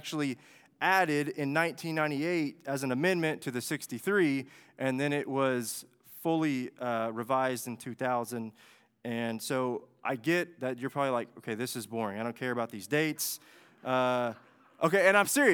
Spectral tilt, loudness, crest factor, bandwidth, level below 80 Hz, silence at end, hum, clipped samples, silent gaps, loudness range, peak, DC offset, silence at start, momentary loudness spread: -4.5 dB/octave; -31 LUFS; 22 dB; 19.5 kHz; -86 dBFS; 0 s; none; under 0.1%; none; 4 LU; -8 dBFS; under 0.1%; 0.05 s; 11 LU